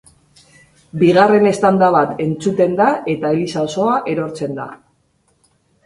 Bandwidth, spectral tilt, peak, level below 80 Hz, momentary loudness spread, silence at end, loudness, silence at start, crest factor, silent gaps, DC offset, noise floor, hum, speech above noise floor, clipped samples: 11.5 kHz; -6.5 dB/octave; 0 dBFS; -56 dBFS; 13 LU; 1.1 s; -15 LUFS; 0.95 s; 16 dB; none; under 0.1%; -61 dBFS; none; 46 dB; under 0.1%